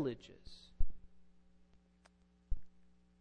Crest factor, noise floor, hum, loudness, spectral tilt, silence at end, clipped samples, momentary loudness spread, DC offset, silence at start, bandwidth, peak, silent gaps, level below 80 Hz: 20 dB; -69 dBFS; none; -49 LUFS; -7.5 dB/octave; 0.5 s; under 0.1%; 22 LU; under 0.1%; 0 s; 5.2 kHz; -18 dBFS; none; -46 dBFS